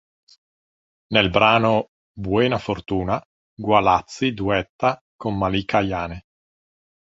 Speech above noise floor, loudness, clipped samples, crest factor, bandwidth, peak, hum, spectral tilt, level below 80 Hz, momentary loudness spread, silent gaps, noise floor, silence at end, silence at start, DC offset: over 70 dB; -21 LUFS; under 0.1%; 20 dB; 8 kHz; -2 dBFS; none; -6 dB/octave; -44 dBFS; 13 LU; 1.88-2.15 s, 3.25-3.57 s, 4.69-4.79 s, 5.01-5.19 s; under -90 dBFS; 0.9 s; 1.1 s; under 0.1%